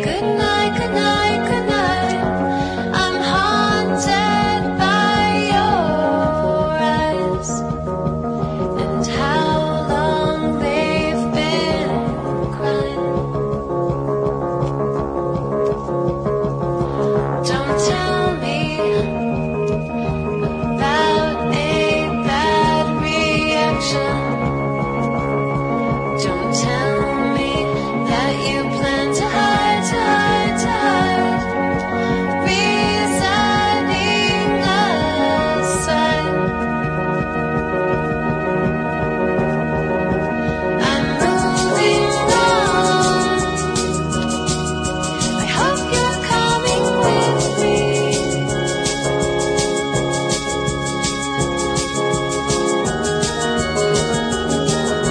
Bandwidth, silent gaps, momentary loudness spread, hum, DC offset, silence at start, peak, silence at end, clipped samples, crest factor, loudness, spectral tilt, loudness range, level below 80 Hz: 10.5 kHz; none; 5 LU; none; under 0.1%; 0 s; -2 dBFS; 0 s; under 0.1%; 16 dB; -18 LUFS; -4.5 dB/octave; 3 LU; -36 dBFS